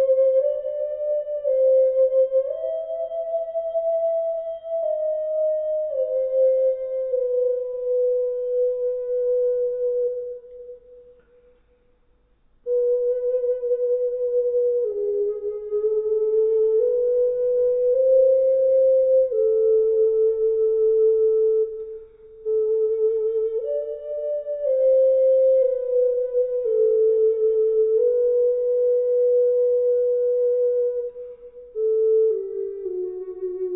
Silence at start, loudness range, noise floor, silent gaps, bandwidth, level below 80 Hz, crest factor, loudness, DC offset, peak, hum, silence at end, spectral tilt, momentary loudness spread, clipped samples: 0 s; 6 LU; -61 dBFS; none; 2.1 kHz; -62 dBFS; 12 dB; -21 LUFS; under 0.1%; -10 dBFS; none; 0 s; -10 dB/octave; 10 LU; under 0.1%